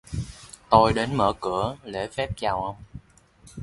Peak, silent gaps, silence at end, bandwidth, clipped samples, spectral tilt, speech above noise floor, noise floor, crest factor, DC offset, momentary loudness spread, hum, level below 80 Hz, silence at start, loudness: -2 dBFS; none; 0 s; 11.5 kHz; under 0.1%; -6 dB/octave; 31 dB; -54 dBFS; 24 dB; under 0.1%; 21 LU; none; -44 dBFS; 0.1 s; -24 LUFS